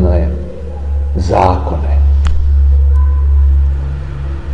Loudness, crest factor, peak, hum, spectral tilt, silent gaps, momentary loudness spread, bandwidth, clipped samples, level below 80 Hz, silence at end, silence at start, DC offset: -13 LUFS; 12 dB; 0 dBFS; none; -8.5 dB/octave; none; 11 LU; 6 kHz; under 0.1%; -12 dBFS; 0 s; 0 s; 4%